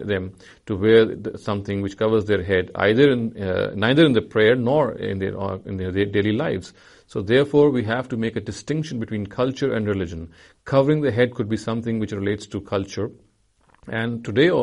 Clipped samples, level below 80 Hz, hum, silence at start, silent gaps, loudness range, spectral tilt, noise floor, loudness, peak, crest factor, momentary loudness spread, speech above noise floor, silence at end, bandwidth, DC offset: under 0.1%; -52 dBFS; none; 0 s; none; 5 LU; -7 dB/octave; -60 dBFS; -21 LUFS; -2 dBFS; 18 dB; 12 LU; 39 dB; 0 s; 10.5 kHz; under 0.1%